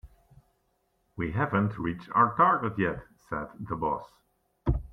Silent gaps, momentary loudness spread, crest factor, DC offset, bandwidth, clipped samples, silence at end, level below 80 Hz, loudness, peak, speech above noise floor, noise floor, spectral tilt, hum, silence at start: none; 14 LU; 22 dB; under 0.1%; 6.4 kHz; under 0.1%; 0.05 s; -44 dBFS; -28 LUFS; -8 dBFS; 45 dB; -73 dBFS; -9 dB/octave; none; 0.05 s